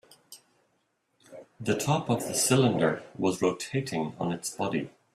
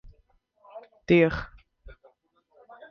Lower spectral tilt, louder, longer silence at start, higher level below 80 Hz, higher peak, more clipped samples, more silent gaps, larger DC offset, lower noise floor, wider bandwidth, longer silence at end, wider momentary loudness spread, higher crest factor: second, -4.5 dB/octave vs -8 dB/octave; second, -28 LUFS vs -23 LUFS; second, 0.3 s vs 0.75 s; second, -66 dBFS vs -50 dBFS; about the same, -10 dBFS vs -8 dBFS; neither; neither; neither; first, -74 dBFS vs -66 dBFS; first, 15 kHz vs 6.6 kHz; second, 0.25 s vs 1.45 s; second, 9 LU vs 27 LU; about the same, 20 dB vs 22 dB